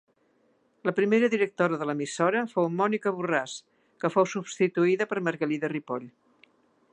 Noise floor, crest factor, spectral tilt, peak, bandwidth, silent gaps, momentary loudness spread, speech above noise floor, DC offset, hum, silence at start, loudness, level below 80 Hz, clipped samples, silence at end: -67 dBFS; 20 dB; -5.5 dB/octave; -8 dBFS; 10 kHz; none; 9 LU; 41 dB; under 0.1%; none; 0.85 s; -27 LUFS; -80 dBFS; under 0.1%; 0.85 s